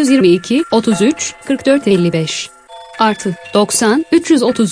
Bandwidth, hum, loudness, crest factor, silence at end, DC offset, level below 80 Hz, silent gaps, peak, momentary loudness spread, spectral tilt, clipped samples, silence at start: 10.5 kHz; none; -13 LUFS; 12 dB; 0 s; under 0.1%; -54 dBFS; none; 0 dBFS; 9 LU; -4.5 dB/octave; under 0.1%; 0 s